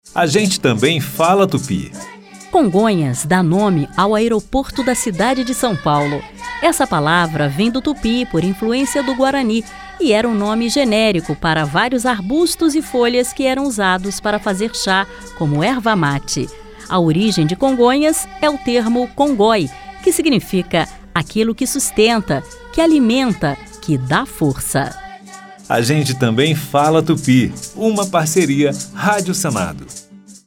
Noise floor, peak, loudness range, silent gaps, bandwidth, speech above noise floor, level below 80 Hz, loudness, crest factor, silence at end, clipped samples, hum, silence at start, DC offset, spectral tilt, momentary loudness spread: -37 dBFS; -2 dBFS; 2 LU; none; 17 kHz; 22 dB; -40 dBFS; -16 LUFS; 14 dB; 0.15 s; under 0.1%; none; 0.05 s; under 0.1%; -5 dB/octave; 8 LU